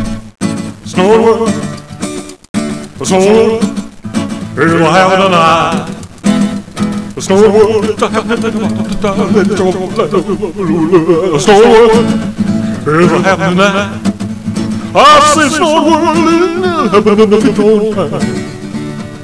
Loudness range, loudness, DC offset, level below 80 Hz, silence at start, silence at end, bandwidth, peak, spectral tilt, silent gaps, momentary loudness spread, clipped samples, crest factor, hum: 4 LU; -10 LUFS; 0.9%; -36 dBFS; 0 s; 0 s; 11 kHz; 0 dBFS; -5 dB/octave; 2.49-2.54 s; 13 LU; 1%; 10 dB; none